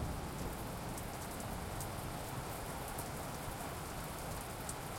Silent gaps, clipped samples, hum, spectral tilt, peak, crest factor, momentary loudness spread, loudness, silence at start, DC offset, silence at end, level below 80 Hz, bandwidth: none; under 0.1%; none; -4.5 dB/octave; -24 dBFS; 20 dB; 1 LU; -43 LUFS; 0 s; under 0.1%; 0 s; -52 dBFS; 16.5 kHz